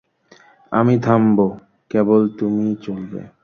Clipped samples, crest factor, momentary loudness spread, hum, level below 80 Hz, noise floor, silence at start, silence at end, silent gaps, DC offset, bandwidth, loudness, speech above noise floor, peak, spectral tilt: under 0.1%; 16 dB; 12 LU; none; -56 dBFS; -51 dBFS; 0.7 s; 0.15 s; none; under 0.1%; 6.6 kHz; -18 LUFS; 34 dB; -2 dBFS; -9.5 dB/octave